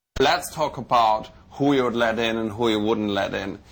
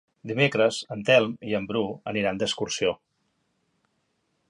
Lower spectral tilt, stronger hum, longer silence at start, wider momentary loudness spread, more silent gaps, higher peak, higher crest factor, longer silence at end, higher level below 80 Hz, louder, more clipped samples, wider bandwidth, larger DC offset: about the same, -5 dB/octave vs -4.5 dB/octave; neither; about the same, 0.15 s vs 0.25 s; about the same, 7 LU vs 9 LU; neither; second, -10 dBFS vs -6 dBFS; second, 12 dB vs 20 dB; second, 0.15 s vs 1.55 s; first, -48 dBFS vs -62 dBFS; about the same, -23 LUFS vs -25 LUFS; neither; first, over 20 kHz vs 11.5 kHz; neither